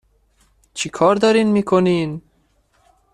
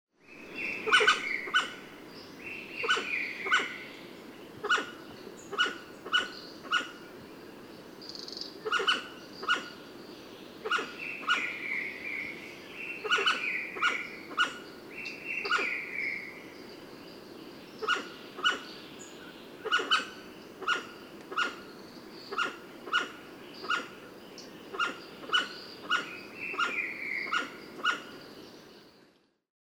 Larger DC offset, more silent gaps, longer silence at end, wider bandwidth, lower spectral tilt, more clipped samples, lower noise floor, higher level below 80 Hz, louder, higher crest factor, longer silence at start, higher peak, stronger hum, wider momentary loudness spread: neither; neither; first, 0.95 s vs 0.6 s; second, 11 kHz vs over 20 kHz; first, -5.5 dB/octave vs -1.5 dB/octave; neither; second, -61 dBFS vs -65 dBFS; first, -56 dBFS vs -74 dBFS; first, -17 LUFS vs -31 LUFS; second, 16 dB vs 24 dB; first, 0.75 s vs 0.25 s; first, -2 dBFS vs -10 dBFS; neither; second, 15 LU vs 19 LU